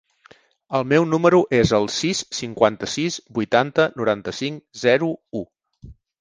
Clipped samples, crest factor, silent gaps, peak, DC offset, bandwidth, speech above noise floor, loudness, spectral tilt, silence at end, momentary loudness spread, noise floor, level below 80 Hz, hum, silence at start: under 0.1%; 20 dB; none; 0 dBFS; under 0.1%; 10 kHz; 33 dB; -20 LUFS; -5 dB/octave; 0.3 s; 12 LU; -53 dBFS; -50 dBFS; none; 0.7 s